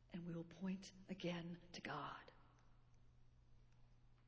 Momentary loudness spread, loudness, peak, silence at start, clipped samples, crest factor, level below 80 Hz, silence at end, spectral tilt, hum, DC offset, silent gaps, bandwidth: 7 LU; -51 LUFS; -36 dBFS; 0 s; under 0.1%; 18 dB; -74 dBFS; 0 s; -5 dB/octave; 60 Hz at -75 dBFS; under 0.1%; none; 7.2 kHz